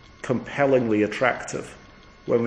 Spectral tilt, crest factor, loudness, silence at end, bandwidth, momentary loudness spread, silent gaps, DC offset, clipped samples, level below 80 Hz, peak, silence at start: -6 dB/octave; 20 dB; -23 LUFS; 0 s; 10.5 kHz; 15 LU; none; under 0.1%; under 0.1%; -54 dBFS; -4 dBFS; 0.25 s